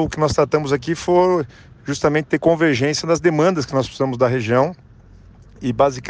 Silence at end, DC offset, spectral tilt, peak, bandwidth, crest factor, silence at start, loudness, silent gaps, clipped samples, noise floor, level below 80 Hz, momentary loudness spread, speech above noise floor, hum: 0 s; under 0.1%; -6 dB/octave; -4 dBFS; 9.8 kHz; 16 dB; 0 s; -18 LUFS; none; under 0.1%; -45 dBFS; -44 dBFS; 7 LU; 27 dB; none